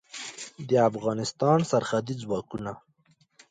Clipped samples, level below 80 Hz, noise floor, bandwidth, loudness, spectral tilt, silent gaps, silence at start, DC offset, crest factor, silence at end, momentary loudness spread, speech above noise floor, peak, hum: under 0.1%; -64 dBFS; -65 dBFS; 9.6 kHz; -27 LUFS; -5.5 dB/octave; none; 0.15 s; under 0.1%; 18 dB; 0.7 s; 15 LU; 39 dB; -10 dBFS; none